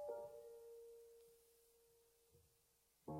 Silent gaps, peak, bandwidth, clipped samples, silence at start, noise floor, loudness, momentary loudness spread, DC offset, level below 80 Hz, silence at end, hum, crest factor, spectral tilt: none; -38 dBFS; 16 kHz; under 0.1%; 0 s; -79 dBFS; -58 LUFS; 15 LU; under 0.1%; -84 dBFS; 0 s; none; 20 dB; -7 dB/octave